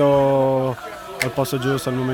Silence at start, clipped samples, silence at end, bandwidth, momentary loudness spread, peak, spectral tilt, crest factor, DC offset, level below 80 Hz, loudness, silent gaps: 0 s; under 0.1%; 0 s; over 20 kHz; 11 LU; -4 dBFS; -6 dB/octave; 16 dB; under 0.1%; -50 dBFS; -20 LUFS; none